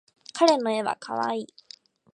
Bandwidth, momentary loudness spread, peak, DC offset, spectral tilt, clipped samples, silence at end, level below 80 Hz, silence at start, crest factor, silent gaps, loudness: 10.5 kHz; 16 LU; -4 dBFS; under 0.1%; -3.5 dB/octave; under 0.1%; 0.7 s; -80 dBFS; 0.35 s; 22 dB; none; -25 LUFS